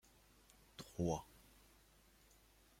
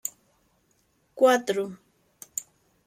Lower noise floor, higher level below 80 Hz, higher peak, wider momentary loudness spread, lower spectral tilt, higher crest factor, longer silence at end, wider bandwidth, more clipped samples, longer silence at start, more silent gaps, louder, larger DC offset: about the same, -69 dBFS vs -68 dBFS; first, -66 dBFS vs -76 dBFS; second, -26 dBFS vs -8 dBFS; first, 26 LU vs 15 LU; first, -6 dB/octave vs -3 dB/octave; about the same, 24 dB vs 20 dB; first, 1.55 s vs 0.45 s; about the same, 16.5 kHz vs 16 kHz; neither; first, 0.8 s vs 0.05 s; neither; second, -45 LUFS vs -26 LUFS; neither